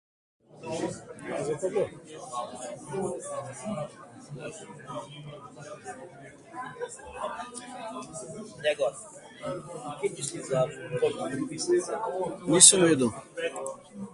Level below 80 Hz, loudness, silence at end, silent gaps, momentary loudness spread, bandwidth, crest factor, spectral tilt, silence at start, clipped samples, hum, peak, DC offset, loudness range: -66 dBFS; -27 LUFS; 0 s; none; 17 LU; 12 kHz; 30 dB; -2.5 dB/octave; 0.55 s; under 0.1%; none; 0 dBFS; under 0.1%; 18 LU